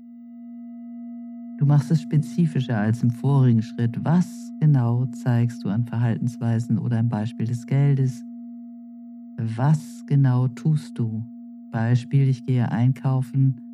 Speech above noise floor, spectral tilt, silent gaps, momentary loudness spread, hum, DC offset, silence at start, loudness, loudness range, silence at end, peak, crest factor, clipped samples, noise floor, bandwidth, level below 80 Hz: 20 dB; -8.5 dB/octave; none; 19 LU; none; under 0.1%; 0 s; -22 LUFS; 3 LU; 0 s; -10 dBFS; 14 dB; under 0.1%; -41 dBFS; 11 kHz; -70 dBFS